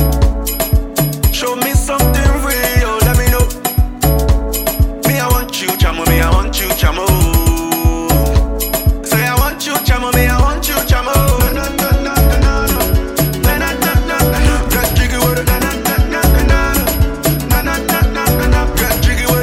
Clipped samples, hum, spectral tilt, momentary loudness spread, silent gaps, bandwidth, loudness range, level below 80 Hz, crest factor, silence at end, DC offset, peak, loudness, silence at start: under 0.1%; none; -4.5 dB/octave; 3 LU; none; 16.5 kHz; 1 LU; -16 dBFS; 12 dB; 0 s; under 0.1%; 0 dBFS; -14 LUFS; 0 s